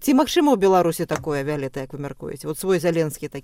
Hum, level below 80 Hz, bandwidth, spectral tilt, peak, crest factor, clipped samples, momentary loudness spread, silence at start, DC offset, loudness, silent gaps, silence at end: none; -50 dBFS; 17 kHz; -5.5 dB/octave; -6 dBFS; 16 dB; under 0.1%; 15 LU; 0 s; under 0.1%; -21 LUFS; none; 0.05 s